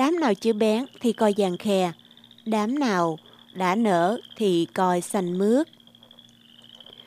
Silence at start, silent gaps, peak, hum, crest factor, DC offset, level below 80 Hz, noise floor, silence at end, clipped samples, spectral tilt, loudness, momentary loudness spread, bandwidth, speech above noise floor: 0 s; none; -8 dBFS; none; 16 dB; under 0.1%; -74 dBFS; -52 dBFS; 0.3 s; under 0.1%; -5.5 dB/octave; -24 LUFS; 7 LU; 15.5 kHz; 29 dB